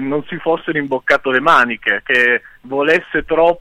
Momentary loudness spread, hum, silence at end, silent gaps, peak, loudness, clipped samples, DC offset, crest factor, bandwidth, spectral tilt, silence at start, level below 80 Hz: 8 LU; none; 0 s; none; -2 dBFS; -15 LUFS; under 0.1%; under 0.1%; 14 dB; 12.5 kHz; -5 dB/octave; 0 s; -46 dBFS